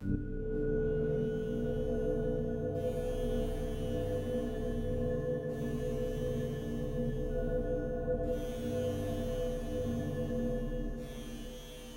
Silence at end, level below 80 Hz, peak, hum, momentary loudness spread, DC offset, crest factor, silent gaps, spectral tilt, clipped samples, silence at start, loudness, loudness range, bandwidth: 0 s; -42 dBFS; -22 dBFS; none; 4 LU; under 0.1%; 14 dB; none; -7.5 dB/octave; under 0.1%; 0 s; -36 LUFS; 2 LU; 16 kHz